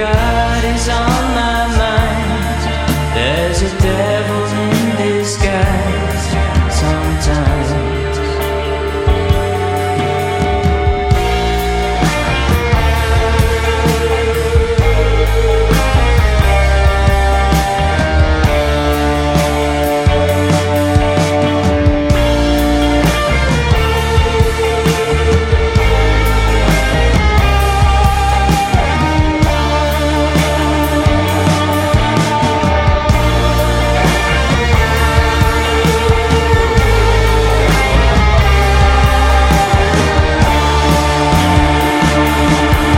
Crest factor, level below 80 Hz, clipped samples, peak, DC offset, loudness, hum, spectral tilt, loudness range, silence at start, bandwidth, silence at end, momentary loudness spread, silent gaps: 12 dB; -16 dBFS; under 0.1%; 0 dBFS; under 0.1%; -13 LUFS; none; -5.5 dB/octave; 4 LU; 0 s; 16.5 kHz; 0 s; 4 LU; none